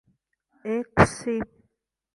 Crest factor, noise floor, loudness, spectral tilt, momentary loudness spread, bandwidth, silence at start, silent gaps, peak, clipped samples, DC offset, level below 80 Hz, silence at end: 24 dB; -74 dBFS; -24 LUFS; -6 dB/octave; 17 LU; 11.5 kHz; 0.65 s; none; -4 dBFS; under 0.1%; under 0.1%; -44 dBFS; 0.7 s